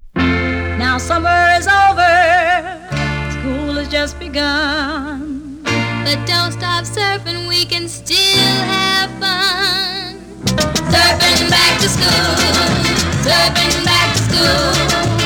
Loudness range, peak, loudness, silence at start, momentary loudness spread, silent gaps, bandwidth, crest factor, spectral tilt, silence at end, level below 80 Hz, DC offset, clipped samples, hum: 6 LU; 0 dBFS; -13 LUFS; 0.05 s; 10 LU; none; over 20 kHz; 14 dB; -3 dB/octave; 0 s; -32 dBFS; under 0.1%; under 0.1%; 60 Hz at -45 dBFS